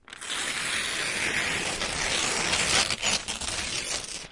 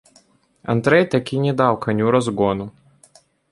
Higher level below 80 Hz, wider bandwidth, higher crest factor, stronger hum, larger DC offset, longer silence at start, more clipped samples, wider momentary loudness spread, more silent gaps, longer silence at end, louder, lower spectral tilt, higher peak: first, -48 dBFS vs -54 dBFS; about the same, 11.5 kHz vs 11.5 kHz; about the same, 18 dB vs 18 dB; neither; neither; second, 0.1 s vs 0.7 s; neither; second, 7 LU vs 11 LU; neither; second, 0 s vs 0.8 s; second, -26 LUFS vs -19 LUFS; second, -0.5 dB/octave vs -7 dB/octave; second, -10 dBFS vs -2 dBFS